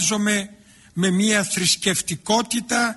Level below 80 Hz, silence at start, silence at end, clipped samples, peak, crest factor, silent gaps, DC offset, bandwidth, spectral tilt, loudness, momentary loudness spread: -56 dBFS; 0 s; 0 s; under 0.1%; -6 dBFS; 14 dB; none; under 0.1%; 12 kHz; -3 dB/octave; -20 LUFS; 6 LU